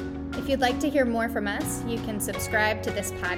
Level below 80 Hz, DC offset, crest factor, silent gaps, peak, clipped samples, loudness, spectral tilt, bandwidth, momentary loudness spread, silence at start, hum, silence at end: -44 dBFS; under 0.1%; 16 dB; none; -10 dBFS; under 0.1%; -27 LUFS; -4.5 dB/octave; 18 kHz; 6 LU; 0 s; none; 0 s